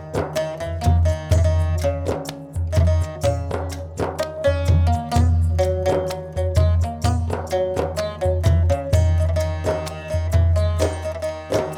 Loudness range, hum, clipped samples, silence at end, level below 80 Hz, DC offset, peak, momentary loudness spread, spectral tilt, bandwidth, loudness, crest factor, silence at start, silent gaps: 2 LU; none; under 0.1%; 0 s; -28 dBFS; under 0.1%; -4 dBFS; 8 LU; -6.5 dB/octave; 13 kHz; -21 LUFS; 16 dB; 0 s; none